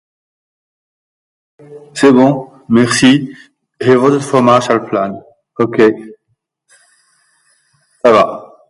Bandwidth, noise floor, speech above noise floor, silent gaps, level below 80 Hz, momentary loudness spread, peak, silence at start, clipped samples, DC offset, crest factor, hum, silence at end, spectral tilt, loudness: 11.5 kHz; -66 dBFS; 56 dB; none; -54 dBFS; 15 LU; 0 dBFS; 1.7 s; under 0.1%; under 0.1%; 14 dB; none; 0.25 s; -5.5 dB/octave; -11 LUFS